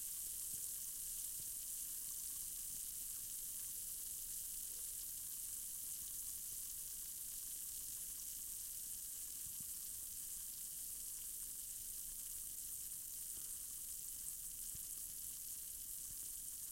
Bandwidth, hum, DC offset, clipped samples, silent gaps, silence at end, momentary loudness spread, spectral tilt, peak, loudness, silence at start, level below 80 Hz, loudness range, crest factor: 16.5 kHz; none; under 0.1%; under 0.1%; none; 0 s; 2 LU; 1 dB/octave; -30 dBFS; -45 LUFS; 0 s; -68 dBFS; 2 LU; 18 dB